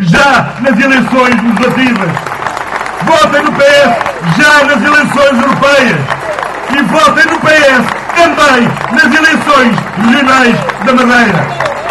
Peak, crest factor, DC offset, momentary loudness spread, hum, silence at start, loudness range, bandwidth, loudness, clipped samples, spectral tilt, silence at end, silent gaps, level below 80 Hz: 0 dBFS; 8 dB; under 0.1%; 9 LU; none; 0 s; 2 LU; 12.5 kHz; -7 LUFS; 2%; -4.5 dB/octave; 0 s; none; -40 dBFS